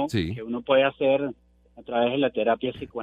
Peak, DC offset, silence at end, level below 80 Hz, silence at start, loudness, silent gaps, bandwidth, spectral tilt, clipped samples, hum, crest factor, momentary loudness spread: -8 dBFS; under 0.1%; 0 s; -54 dBFS; 0 s; -25 LUFS; none; 9.2 kHz; -6.5 dB/octave; under 0.1%; none; 18 dB; 10 LU